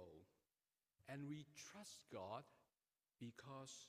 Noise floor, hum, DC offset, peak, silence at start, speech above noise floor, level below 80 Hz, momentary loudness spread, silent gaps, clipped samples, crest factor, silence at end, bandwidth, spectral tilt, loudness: under -90 dBFS; none; under 0.1%; -38 dBFS; 0 s; over 34 dB; under -90 dBFS; 10 LU; none; under 0.1%; 20 dB; 0 s; 15.5 kHz; -4.5 dB/octave; -56 LUFS